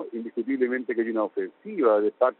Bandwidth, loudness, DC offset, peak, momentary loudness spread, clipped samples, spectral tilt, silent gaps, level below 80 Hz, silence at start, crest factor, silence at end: 4.2 kHz; -26 LUFS; under 0.1%; -8 dBFS; 11 LU; under 0.1%; -5 dB/octave; none; -78 dBFS; 0 s; 16 dB; 0.05 s